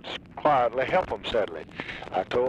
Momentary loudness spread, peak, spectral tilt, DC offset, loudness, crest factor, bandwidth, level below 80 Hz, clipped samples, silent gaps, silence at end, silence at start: 13 LU; -10 dBFS; -5.5 dB/octave; under 0.1%; -27 LUFS; 16 dB; 10 kHz; -52 dBFS; under 0.1%; none; 0 s; 0.05 s